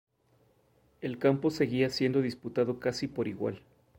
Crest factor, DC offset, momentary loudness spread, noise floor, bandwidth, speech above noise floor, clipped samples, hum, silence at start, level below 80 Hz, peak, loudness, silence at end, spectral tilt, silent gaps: 18 dB; under 0.1%; 10 LU; -68 dBFS; 16.5 kHz; 38 dB; under 0.1%; none; 1 s; -66 dBFS; -12 dBFS; -31 LUFS; 0.4 s; -6.5 dB/octave; none